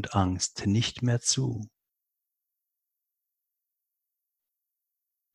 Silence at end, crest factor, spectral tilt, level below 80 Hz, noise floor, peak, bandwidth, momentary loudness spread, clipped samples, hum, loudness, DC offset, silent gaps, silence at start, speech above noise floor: 3.7 s; 24 dB; -4 dB/octave; -50 dBFS; -85 dBFS; -8 dBFS; 12 kHz; 10 LU; under 0.1%; none; -27 LUFS; under 0.1%; none; 0 s; 58 dB